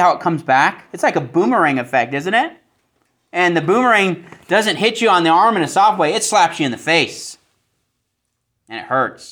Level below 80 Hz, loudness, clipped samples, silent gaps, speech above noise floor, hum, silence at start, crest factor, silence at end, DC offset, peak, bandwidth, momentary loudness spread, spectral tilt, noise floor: -66 dBFS; -15 LUFS; under 0.1%; none; 57 dB; none; 0 s; 16 dB; 0.05 s; under 0.1%; 0 dBFS; over 20 kHz; 9 LU; -4 dB/octave; -73 dBFS